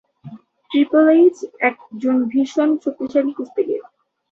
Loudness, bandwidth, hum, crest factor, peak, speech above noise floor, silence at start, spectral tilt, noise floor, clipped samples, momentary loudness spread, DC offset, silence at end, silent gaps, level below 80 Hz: -18 LUFS; 7.6 kHz; none; 16 dB; -2 dBFS; 23 dB; 0.25 s; -6 dB/octave; -40 dBFS; under 0.1%; 11 LU; under 0.1%; 0.5 s; none; -68 dBFS